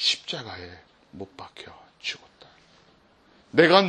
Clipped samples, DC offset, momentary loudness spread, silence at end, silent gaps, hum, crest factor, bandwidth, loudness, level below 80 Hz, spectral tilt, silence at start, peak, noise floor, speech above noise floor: under 0.1%; under 0.1%; 23 LU; 0 s; none; none; 24 dB; 10.5 kHz; -25 LUFS; -68 dBFS; -4 dB/octave; 0 s; -2 dBFS; -59 dBFS; 34 dB